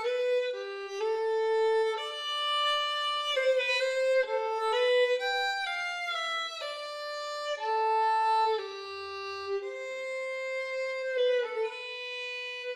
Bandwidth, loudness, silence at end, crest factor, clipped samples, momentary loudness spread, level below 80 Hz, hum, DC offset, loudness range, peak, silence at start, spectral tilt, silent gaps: 12.5 kHz; -30 LUFS; 0 s; 14 dB; under 0.1%; 10 LU; -82 dBFS; none; under 0.1%; 5 LU; -16 dBFS; 0 s; 0.5 dB/octave; none